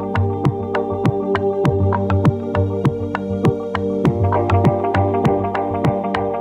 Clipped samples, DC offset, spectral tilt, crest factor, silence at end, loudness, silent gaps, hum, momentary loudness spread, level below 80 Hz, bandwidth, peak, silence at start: under 0.1%; under 0.1%; -9 dB/octave; 14 dB; 0 s; -18 LUFS; none; none; 4 LU; -42 dBFS; 8.4 kHz; -4 dBFS; 0 s